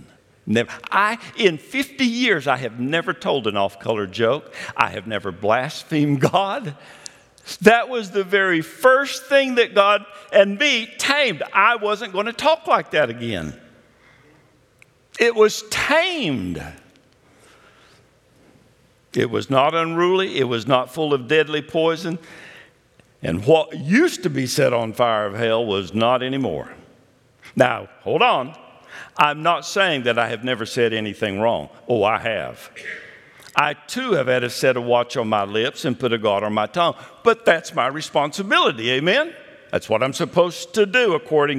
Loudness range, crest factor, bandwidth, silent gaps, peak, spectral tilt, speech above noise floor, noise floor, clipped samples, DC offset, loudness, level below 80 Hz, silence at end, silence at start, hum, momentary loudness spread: 5 LU; 20 dB; 15.5 kHz; none; 0 dBFS; -4.5 dB/octave; 37 dB; -56 dBFS; under 0.1%; under 0.1%; -19 LUFS; -60 dBFS; 0 s; 0.45 s; none; 11 LU